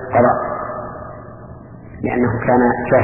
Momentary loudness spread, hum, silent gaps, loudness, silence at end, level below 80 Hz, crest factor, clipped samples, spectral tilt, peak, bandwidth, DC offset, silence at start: 22 LU; none; none; -17 LUFS; 0 s; -42 dBFS; 16 dB; under 0.1%; -12 dB/octave; -2 dBFS; 3 kHz; under 0.1%; 0 s